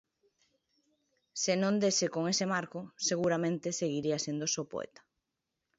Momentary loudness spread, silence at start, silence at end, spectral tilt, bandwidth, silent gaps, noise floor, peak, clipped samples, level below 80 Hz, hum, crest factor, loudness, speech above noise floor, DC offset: 12 LU; 1.35 s; 0.9 s; -3.5 dB/octave; 8 kHz; none; -87 dBFS; -16 dBFS; under 0.1%; -76 dBFS; none; 18 dB; -32 LUFS; 54 dB; under 0.1%